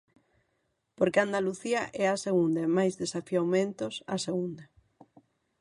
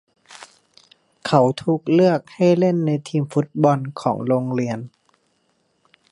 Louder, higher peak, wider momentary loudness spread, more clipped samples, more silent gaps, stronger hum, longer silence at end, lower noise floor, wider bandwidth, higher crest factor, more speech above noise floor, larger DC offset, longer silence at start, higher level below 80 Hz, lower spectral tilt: second, -29 LUFS vs -20 LUFS; second, -10 dBFS vs -2 dBFS; about the same, 8 LU vs 8 LU; neither; neither; neither; second, 0.95 s vs 1.25 s; first, -77 dBFS vs -66 dBFS; about the same, 11.5 kHz vs 11 kHz; about the same, 20 dB vs 20 dB; about the same, 48 dB vs 48 dB; neither; first, 1 s vs 0.3 s; second, -72 dBFS vs -66 dBFS; second, -5.5 dB/octave vs -7.5 dB/octave